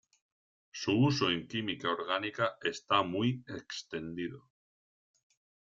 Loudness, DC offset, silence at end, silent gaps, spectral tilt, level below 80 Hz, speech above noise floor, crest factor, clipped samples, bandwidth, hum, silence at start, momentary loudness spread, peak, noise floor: -33 LUFS; under 0.1%; 1.3 s; none; -5.5 dB/octave; -70 dBFS; over 57 dB; 22 dB; under 0.1%; 7.6 kHz; none; 0.75 s; 13 LU; -14 dBFS; under -90 dBFS